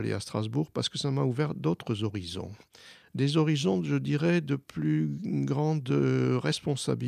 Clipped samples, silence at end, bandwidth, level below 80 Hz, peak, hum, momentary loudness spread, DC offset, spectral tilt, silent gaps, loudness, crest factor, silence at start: under 0.1%; 0 s; 12.5 kHz; -64 dBFS; -14 dBFS; none; 7 LU; under 0.1%; -6.5 dB/octave; none; -29 LUFS; 16 dB; 0 s